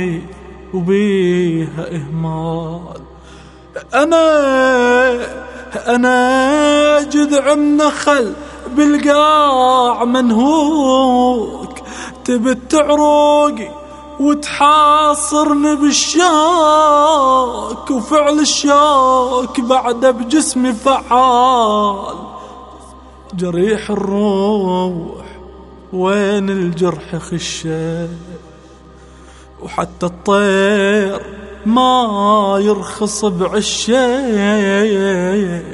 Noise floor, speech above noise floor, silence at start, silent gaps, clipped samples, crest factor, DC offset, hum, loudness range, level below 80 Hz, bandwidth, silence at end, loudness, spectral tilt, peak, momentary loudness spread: -39 dBFS; 26 dB; 0 s; none; under 0.1%; 14 dB; under 0.1%; none; 7 LU; -42 dBFS; 11.5 kHz; 0 s; -13 LUFS; -4.5 dB/octave; 0 dBFS; 16 LU